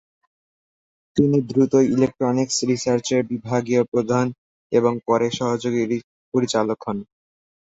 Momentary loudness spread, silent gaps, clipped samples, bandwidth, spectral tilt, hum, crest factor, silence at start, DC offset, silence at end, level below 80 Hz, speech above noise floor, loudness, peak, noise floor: 7 LU; 3.88-3.92 s, 4.38-4.70 s, 6.04-6.32 s; under 0.1%; 8 kHz; -5.5 dB/octave; none; 18 dB; 1.15 s; under 0.1%; 0.7 s; -58 dBFS; over 70 dB; -21 LUFS; -4 dBFS; under -90 dBFS